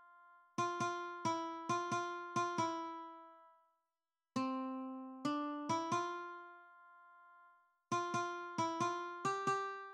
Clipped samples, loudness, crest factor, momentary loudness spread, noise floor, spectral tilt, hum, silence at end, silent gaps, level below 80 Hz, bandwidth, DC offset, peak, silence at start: under 0.1%; -40 LUFS; 16 dB; 13 LU; under -90 dBFS; -4.5 dB/octave; none; 0 s; none; -88 dBFS; 12 kHz; under 0.1%; -24 dBFS; 0 s